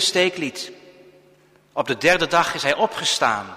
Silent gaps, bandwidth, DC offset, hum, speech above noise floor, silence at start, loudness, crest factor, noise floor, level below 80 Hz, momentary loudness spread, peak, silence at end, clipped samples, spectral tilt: none; 15.5 kHz; under 0.1%; none; 34 dB; 0 s; -20 LUFS; 18 dB; -55 dBFS; -58 dBFS; 13 LU; -4 dBFS; 0 s; under 0.1%; -2.5 dB/octave